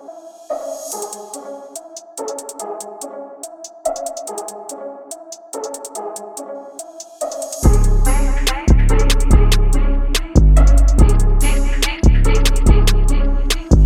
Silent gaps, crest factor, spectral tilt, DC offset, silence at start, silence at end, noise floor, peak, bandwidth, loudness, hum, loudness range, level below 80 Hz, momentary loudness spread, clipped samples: none; 14 dB; -5 dB/octave; under 0.1%; 0.1 s; 0 s; -37 dBFS; 0 dBFS; 14.5 kHz; -18 LUFS; none; 13 LU; -16 dBFS; 18 LU; under 0.1%